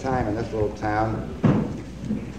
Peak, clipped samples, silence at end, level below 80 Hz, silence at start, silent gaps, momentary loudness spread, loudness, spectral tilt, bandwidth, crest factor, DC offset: -8 dBFS; under 0.1%; 0 s; -40 dBFS; 0 s; none; 9 LU; -25 LUFS; -8 dB/octave; 10 kHz; 18 dB; 0.4%